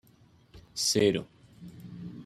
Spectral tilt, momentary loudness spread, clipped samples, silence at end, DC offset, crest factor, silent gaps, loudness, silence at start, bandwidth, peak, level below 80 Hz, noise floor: -3.5 dB/octave; 26 LU; under 0.1%; 0 s; under 0.1%; 20 dB; none; -27 LUFS; 0.55 s; 14 kHz; -12 dBFS; -64 dBFS; -60 dBFS